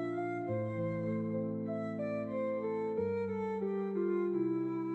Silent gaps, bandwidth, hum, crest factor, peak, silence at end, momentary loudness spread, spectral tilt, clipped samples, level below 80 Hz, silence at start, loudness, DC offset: none; 7.8 kHz; none; 10 dB; -24 dBFS; 0 s; 4 LU; -10 dB/octave; under 0.1%; -74 dBFS; 0 s; -36 LUFS; under 0.1%